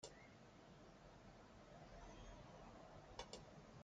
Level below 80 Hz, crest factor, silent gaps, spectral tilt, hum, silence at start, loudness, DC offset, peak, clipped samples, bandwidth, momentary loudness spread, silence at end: -68 dBFS; 24 dB; none; -4 dB/octave; none; 0 s; -61 LUFS; under 0.1%; -38 dBFS; under 0.1%; 8.8 kHz; 7 LU; 0 s